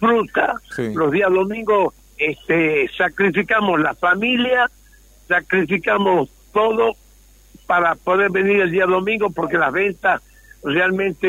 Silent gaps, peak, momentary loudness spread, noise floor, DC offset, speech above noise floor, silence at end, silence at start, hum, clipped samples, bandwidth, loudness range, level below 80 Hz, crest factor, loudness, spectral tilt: none; -4 dBFS; 6 LU; -49 dBFS; under 0.1%; 31 dB; 0 s; 0 s; none; under 0.1%; 16 kHz; 1 LU; -50 dBFS; 14 dB; -18 LUFS; -6 dB/octave